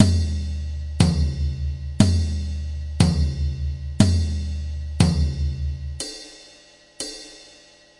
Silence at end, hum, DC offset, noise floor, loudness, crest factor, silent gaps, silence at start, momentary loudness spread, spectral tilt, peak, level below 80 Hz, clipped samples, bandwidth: 0.55 s; none; under 0.1%; -50 dBFS; -23 LUFS; 22 dB; none; 0 s; 13 LU; -6 dB/octave; -2 dBFS; -30 dBFS; under 0.1%; 11.5 kHz